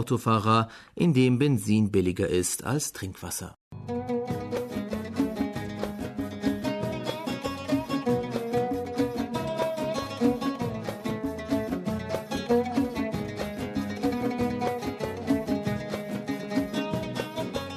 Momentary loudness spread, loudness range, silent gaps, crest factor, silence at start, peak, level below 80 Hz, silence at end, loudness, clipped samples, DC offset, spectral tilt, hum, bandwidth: 9 LU; 5 LU; 3.61-3.71 s; 20 dB; 0 s; -10 dBFS; -52 dBFS; 0 s; -29 LUFS; under 0.1%; under 0.1%; -5.5 dB/octave; none; 13.5 kHz